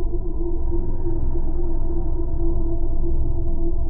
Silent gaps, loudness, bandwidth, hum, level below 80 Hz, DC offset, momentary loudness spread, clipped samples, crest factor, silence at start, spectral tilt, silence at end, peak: none; -27 LUFS; 1.1 kHz; none; -18 dBFS; under 0.1%; 2 LU; under 0.1%; 8 dB; 0 s; -12.5 dB/octave; 0 s; -8 dBFS